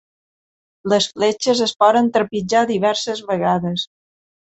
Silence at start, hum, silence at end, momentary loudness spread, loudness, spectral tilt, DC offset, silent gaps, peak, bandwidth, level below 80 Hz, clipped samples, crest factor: 0.85 s; none; 0.75 s; 9 LU; -18 LUFS; -4.5 dB/octave; under 0.1%; none; -2 dBFS; 8.2 kHz; -60 dBFS; under 0.1%; 18 dB